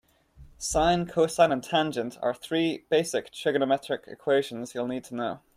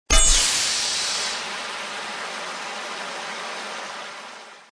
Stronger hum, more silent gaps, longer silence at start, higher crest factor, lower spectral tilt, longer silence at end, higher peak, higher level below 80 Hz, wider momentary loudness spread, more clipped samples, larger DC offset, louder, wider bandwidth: neither; neither; first, 0.4 s vs 0.1 s; about the same, 20 dB vs 22 dB; first, -4.5 dB/octave vs 0 dB/octave; first, 0.2 s vs 0.05 s; second, -8 dBFS vs -2 dBFS; second, -50 dBFS vs -30 dBFS; second, 10 LU vs 18 LU; neither; neither; second, -27 LUFS vs -23 LUFS; first, 15.5 kHz vs 11 kHz